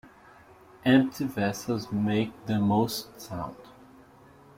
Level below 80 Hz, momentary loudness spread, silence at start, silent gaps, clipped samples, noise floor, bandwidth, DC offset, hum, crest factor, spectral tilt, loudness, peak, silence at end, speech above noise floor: -60 dBFS; 14 LU; 0.05 s; none; under 0.1%; -54 dBFS; 16.5 kHz; under 0.1%; none; 20 dB; -6 dB/octave; -27 LUFS; -8 dBFS; 0.85 s; 27 dB